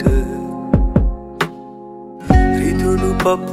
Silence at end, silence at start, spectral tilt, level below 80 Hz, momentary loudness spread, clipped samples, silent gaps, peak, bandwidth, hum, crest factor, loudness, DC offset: 0 s; 0 s; -7 dB/octave; -20 dBFS; 20 LU; under 0.1%; none; 0 dBFS; 15 kHz; none; 16 dB; -17 LUFS; under 0.1%